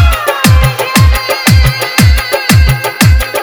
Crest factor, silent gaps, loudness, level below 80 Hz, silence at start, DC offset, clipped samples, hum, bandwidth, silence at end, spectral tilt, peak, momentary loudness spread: 8 dB; none; -9 LUFS; -12 dBFS; 0 s; under 0.1%; 1%; none; over 20 kHz; 0 s; -4.5 dB/octave; 0 dBFS; 2 LU